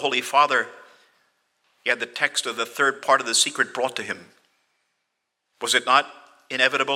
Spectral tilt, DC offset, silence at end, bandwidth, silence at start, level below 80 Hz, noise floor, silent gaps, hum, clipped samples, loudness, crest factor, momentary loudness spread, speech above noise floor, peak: -0.5 dB/octave; under 0.1%; 0 s; 16.5 kHz; 0 s; -84 dBFS; -78 dBFS; none; none; under 0.1%; -22 LUFS; 22 dB; 13 LU; 56 dB; -2 dBFS